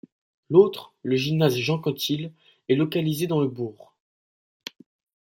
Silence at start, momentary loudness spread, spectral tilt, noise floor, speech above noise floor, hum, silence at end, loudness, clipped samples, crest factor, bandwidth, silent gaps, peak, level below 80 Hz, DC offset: 0.5 s; 22 LU; -6.5 dB/octave; under -90 dBFS; over 67 dB; none; 1.55 s; -24 LUFS; under 0.1%; 22 dB; 16.5 kHz; none; -4 dBFS; -66 dBFS; under 0.1%